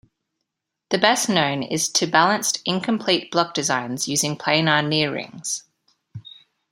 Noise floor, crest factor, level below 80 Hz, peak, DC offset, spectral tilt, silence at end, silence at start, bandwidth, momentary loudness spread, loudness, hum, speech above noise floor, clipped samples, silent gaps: -80 dBFS; 22 dB; -66 dBFS; 0 dBFS; under 0.1%; -3 dB/octave; 0.45 s; 0.9 s; 16 kHz; 10 LU; -20 LUFS; none; 59 dB; under 0.1%; none